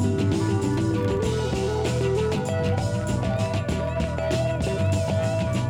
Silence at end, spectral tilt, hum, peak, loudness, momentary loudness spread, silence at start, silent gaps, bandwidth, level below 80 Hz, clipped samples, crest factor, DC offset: 0 s; -6.5 dB/octave; none; -12 dBFS; -25 LUFS; 2 LU; 0 s; none; 14.5 kHz; -38 dBFS; under 0.1%; 12 dB; under 0.1%